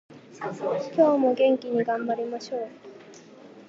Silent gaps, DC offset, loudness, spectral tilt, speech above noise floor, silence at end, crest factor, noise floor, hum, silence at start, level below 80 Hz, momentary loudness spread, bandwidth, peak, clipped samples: none; under 0.1%; -25 LUFS; -6 dB/octave; 24 dB; 0.05 s; 18 dB; -48 dBFS; none; 0.1 s; -82 dBFS; 16 LU; 7.6 kHz; -8 dBFS; under 0.1%